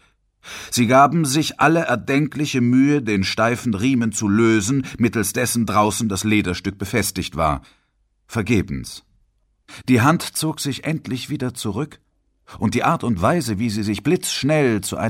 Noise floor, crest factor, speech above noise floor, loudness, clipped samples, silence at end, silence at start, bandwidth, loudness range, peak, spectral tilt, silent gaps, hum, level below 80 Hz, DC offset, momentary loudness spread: -65 dBFS; 18 dB; 46 dB; -19 LUFS; under 0.1%; 0 s; 0.45 s; 16.5 kHz; 5 LU; -2 dBFS; -5 dB/octave; none; none; -46 dBFS; under 0.1%; 10 LU